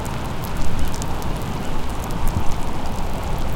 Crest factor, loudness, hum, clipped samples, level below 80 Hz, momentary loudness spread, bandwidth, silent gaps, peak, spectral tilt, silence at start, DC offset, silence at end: 14 dB; -27 LUFS; none; under 0.1%; -24 dBFS; 3 LU; 16.5 kHz; none; -4 dBFS; -5.5 dB/octave; 0 s; under 0.1%; 0 s